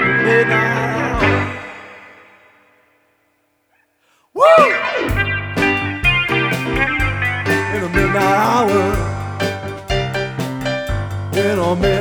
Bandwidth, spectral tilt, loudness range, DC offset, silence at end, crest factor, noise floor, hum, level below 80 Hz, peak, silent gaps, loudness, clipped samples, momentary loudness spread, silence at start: over 20 kHz; -5.5 dB/octave; 7 LU; under 0.1%; 0 s; 18 dB; -63 dBFS; none; -32 dBFS; 0 dBFS; none; -16 LUFS; under 0.1%; 10 LU; 0 s